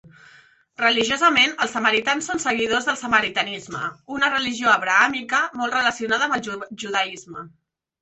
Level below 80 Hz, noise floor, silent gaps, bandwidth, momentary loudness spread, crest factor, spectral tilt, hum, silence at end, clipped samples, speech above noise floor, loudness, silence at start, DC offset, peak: -60 dBFS; -52 dBFS; none; 8.4 kHz; 13 LU; 20 dB; -2 dB/octave; none; 0.55 s; under 0.1%; 31 dB; -20 LUFS; 0.05 s; under 0.1%; -2 dBFS